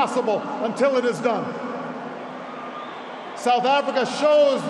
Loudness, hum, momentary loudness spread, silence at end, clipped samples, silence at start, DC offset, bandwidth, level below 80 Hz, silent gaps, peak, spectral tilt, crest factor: -22 LUFS; none; 15 LU; 0 s; under 0.1%; 0 s; under 0.1%; 11.5 kHz; -76 dBFS; none; -8 dBFS; -4.5 dB/octave; 14 dB